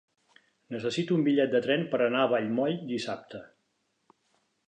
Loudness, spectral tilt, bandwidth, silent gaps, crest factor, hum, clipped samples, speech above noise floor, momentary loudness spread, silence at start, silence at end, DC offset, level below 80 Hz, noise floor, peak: -28 LUFS; -6 dB/octave; 9.6 kHz; none; 16 dB; none; under 0.1%; 48 dB; 15 LU; 0.7 s; 1.25 s; under 0.1%; -78 dBFS; -76 dBFS; -14 dBFS